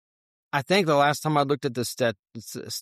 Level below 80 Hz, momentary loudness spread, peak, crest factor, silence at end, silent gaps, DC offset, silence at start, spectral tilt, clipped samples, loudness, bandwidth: -68 dBFS; 15 LU; -8 dBFS; 18 dB; 0 s; 2.19-2.23 s; under 0.1%; 0.55 s; -4.5 dB/octave; under 0.1%; -24 LUFS; 15 kHz